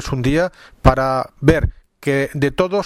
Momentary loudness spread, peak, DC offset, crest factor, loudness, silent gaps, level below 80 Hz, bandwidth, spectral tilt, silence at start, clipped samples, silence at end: 7 LU; 0 dBFS; under 0.1%; 18 dB; -18 LUFS; none; -28 dBFS; 15 kHz; -7 dB/octave; 0 s; under 0.1%; 0 s